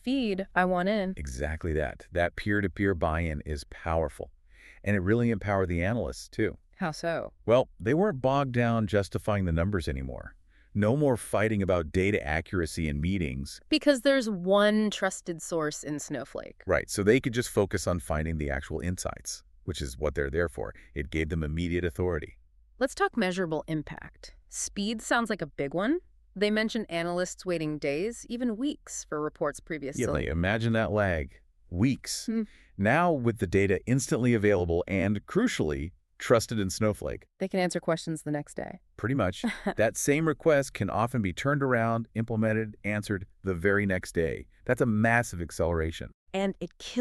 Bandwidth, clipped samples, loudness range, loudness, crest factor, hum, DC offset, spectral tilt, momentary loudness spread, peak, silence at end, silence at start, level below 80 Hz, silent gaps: 13.5 kHz; under 0.1%; 4 LU; -29 LUFS; 20 dB; none; under 0.1%; -5.5 dB/octave; 11 LU; -8 dBFS; 0 s; 0.05 s; -46 dBFS; 46.14-46.27 s